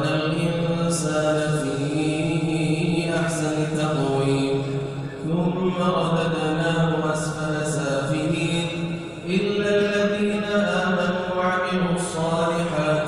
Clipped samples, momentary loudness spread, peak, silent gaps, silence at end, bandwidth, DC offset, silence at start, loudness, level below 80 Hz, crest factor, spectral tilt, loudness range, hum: under 0.1%; 4 LU; -8 dBFS; none; 0 s; 13 kHz; under 0.1%; 0 s; -23 LUFS; -50 dBFS; 14 dB; -5.5 dB/octave; 1 LU; none